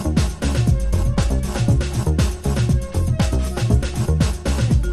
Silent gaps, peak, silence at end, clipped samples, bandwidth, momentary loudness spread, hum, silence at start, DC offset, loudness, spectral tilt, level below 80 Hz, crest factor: none; -4 dBFS; 0 s; under 0.1%; 13.5 kHz; 2 LU; none; 0 s; under 0.1%; -20 LUFS; -6.5 dB/octave; -22 dBFS; 14 dB